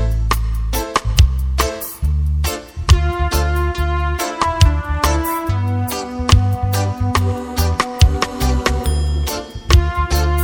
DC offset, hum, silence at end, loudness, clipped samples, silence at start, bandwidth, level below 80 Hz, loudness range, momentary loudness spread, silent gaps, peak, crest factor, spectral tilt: under 0.1%; none; 0 s; -18 LUFS; under 0.1%; 0 s; over 20 kHz; -20 dBFS; 1 LU; 6 LU; none; 0 dBFS; 16 dB; -5 dB/octave